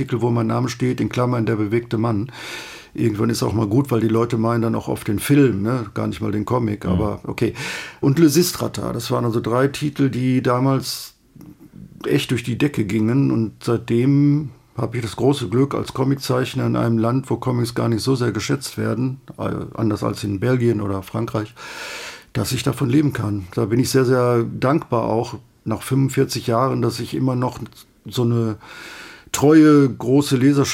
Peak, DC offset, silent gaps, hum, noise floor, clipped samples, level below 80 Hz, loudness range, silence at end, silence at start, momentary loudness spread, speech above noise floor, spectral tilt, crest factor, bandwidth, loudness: -2 dBFS; under 0.1%; none; none; -44 dBFS; under 0.1%; -50 dBFS; 3 LU; 0 s; 0 s; 11 LU; 25 dB; -6.5 dB/octave; 16 dB; 16.5 kHz; -20 LUFS